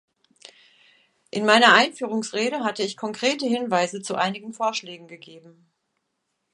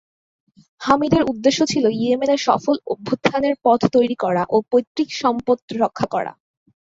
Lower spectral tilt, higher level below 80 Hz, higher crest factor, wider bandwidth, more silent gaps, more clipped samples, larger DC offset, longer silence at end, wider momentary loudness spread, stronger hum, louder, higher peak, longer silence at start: second, -3 dB/octave vs -5 dB/octave; second, -76 dBFS vs -54 dBFS; first, 24 dB vs 18 dB; first, 11.5 kHz vs 7.8 kHz; second, none vs 4.87-4.95 s, 5.62-5.68 s; neither; neither; first, 1.15 s vs 0.55 s; first, 17 LU vs 7 LU; neither; second, -22 LUFS vs -19 LUFS; about the same, 0 dBFS vs -2 dBFS; first, 1.35 s vs 0.8 s